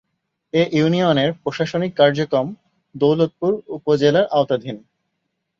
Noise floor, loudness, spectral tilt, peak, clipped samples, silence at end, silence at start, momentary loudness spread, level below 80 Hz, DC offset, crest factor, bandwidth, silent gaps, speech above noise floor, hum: -75 dBFS; -19 LUFS; -7 dB/octave; -2 dBFS; under 0.1%; 0.8 s; 0.55 s; 8 LU; -60 dBFS; under 0.1%; 16 dB; 7.4 kHz; none; 57 dB; none